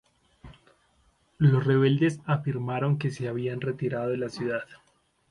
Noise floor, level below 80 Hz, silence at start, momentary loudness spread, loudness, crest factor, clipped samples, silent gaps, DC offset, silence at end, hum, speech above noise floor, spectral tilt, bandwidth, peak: -66 dBFS; -62 dBFS; 0.45 s; 9 LU; -27 LUFS; 16 dB; under 0.1%; none; under 0.1%; 0.55 s; none; 40 dB; -8 dB/octave; 10.5 kHz; -10 dBFS